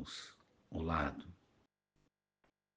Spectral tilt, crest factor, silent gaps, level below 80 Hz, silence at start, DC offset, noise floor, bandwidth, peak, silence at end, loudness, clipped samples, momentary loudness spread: -5.5 dB/octave; 24 dB; none; -58 dBFS; 0 s; under 0.1%; -81 dBFS; 9.6 kHz; -22 dBFS; 1.4 s; -41 LUFS; under 0.1%; 18 LU